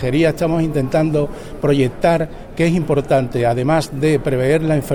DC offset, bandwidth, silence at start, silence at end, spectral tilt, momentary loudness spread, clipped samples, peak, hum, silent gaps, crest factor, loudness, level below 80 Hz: under 0.1%; 17.5 kHz; 0 s; 0 s; -7 dB/octave; 4 LU; under 0.1%; -2 dBFS; none; none; 14 dB; -17 LUFS; -36 dBFS